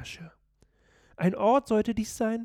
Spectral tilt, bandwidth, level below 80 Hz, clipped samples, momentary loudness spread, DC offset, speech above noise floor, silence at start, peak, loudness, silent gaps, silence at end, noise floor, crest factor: -6 dB/octave; 16 kHz; -56 dBFS; under 0.1%; 15 LU; under 0.1%; 39 dB; 0 s; -12 dBFS; -26 LUFS; none; 0 s; -65 dBFS; 16 dB